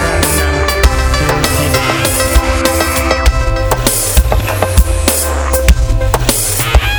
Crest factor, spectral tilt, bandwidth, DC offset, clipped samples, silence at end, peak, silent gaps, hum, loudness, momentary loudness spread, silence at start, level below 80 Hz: 12 dB; -3.5 dB/octave; over 20 kHz; 0.1%; 1%; 0 s; 0 dBFS; none; none; -12 LUFS; 2 LU; 0 s; -14 dBFS